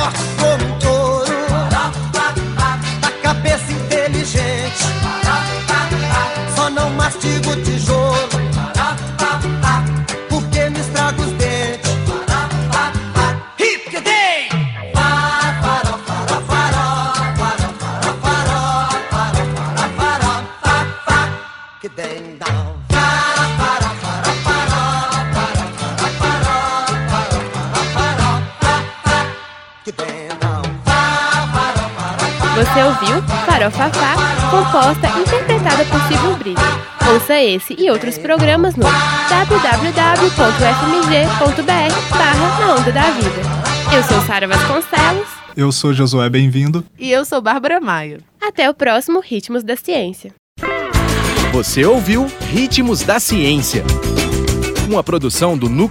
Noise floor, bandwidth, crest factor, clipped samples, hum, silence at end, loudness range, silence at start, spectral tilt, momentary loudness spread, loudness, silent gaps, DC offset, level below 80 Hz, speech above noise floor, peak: -36 dBFS; 16.5 kHz; 16 dB; under 0.1%; none; 0 s; 5 LU; 0 s; -4.5 dB/octave; 7 LU; -15 LUFS; 50.39-50.56 s; under 0.1%; -30 dBFS; 22 dB; 0 dBFS